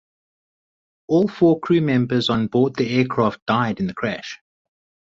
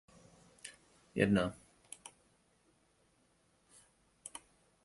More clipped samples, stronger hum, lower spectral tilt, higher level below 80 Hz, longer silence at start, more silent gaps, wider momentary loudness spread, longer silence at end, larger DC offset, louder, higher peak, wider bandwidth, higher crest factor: neither; neither; first, -7 dB/octave vs -5.5 dB/octave; first, -56 dBFS vs -66 dBFS; first, 1.1 s vs 0.65 s; first, 3.42-3.46 s vs none; second, 9 LU vs 23 LU; first, 0.7 s vs 0.45 s; neither; first, -20 LUFS vs -34 LUFS; first, -4 dBFS vs -16 dBFS; second, 7.8 kHz vs 11.5 kHz; second, 16 dB vs 26 dB